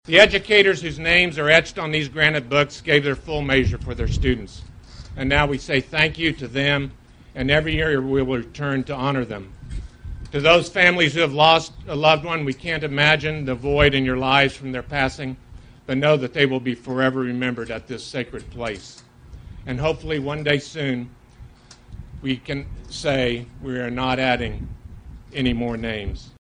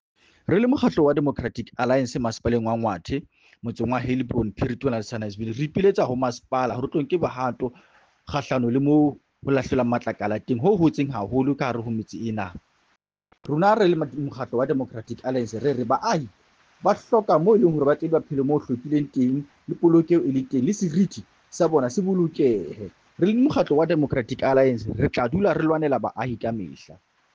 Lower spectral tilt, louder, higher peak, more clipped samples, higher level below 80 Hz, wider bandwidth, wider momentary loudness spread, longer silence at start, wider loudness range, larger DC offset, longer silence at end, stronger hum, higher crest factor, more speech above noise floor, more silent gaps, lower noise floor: second, -5 dB/octave vs -7.5 dB/octave; first, -20 LUFS vs -23 LUFS; first, 0 dBFS vs -6 dBFS; neither; first, -38 dBFS vs -50 dBFS; first, 10.5 kHz vs 7.6 kHz; first, 17 LU vs 11 LU; second, 0.05 s vs 0.5 s; first, 9 LU vs 4 LU; neither; second, 0.15 s vs 0.5 s; neither; first, 22 dB vs 16 dB; second, 25 dB vs 46 dB; neither; second, -45 dBFS vs -69 dBFS